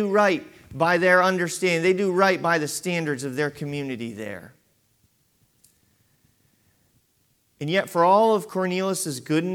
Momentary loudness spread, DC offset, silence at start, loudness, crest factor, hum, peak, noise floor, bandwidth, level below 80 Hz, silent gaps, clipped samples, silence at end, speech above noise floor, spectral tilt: 14 LU; under 0.1%; 0 s; -22 LUFS; 18 dB; none; -6 dBFS; -67 dBFS; 17 kHz; -68 dBFS; none; under 0.1%; 0 s; 44 dB; -4.5 dB/octave